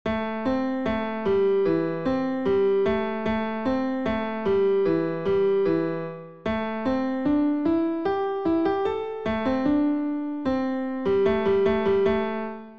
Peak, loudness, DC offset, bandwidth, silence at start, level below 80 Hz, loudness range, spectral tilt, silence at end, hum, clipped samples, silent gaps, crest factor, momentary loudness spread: -12 dBFS; -25 LUFS; 0.5%; 6.2 kHz; 0.05 s; -50 dBFS; 1 LU; -8 dB/octave; 0 s; none; under 0.1%; none; 12 dB; 6 LU